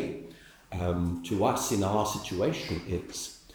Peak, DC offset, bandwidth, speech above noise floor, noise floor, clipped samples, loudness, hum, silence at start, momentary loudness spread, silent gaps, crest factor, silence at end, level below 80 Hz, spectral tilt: -12 dBFS; under 0.1%; over 20 kHz; 21 dB; -50 dBFS; under 0.1%; -30 LUFS; none; 0 s; 11 LU; none; 18 dB; 0 s; -52 dBFS; -5 dB/octave